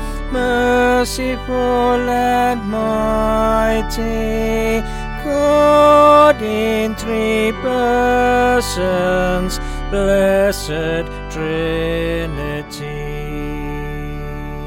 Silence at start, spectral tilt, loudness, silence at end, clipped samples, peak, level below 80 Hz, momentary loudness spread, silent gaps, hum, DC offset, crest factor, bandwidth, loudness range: 0 s; -5 dB/octave; -16 LUFS; 0 s; under 0.1%; -2 dBFS; -28 dBFS; 14 LU; none; none; under 0.1%; 14 dB; 17 kHz; 8 LU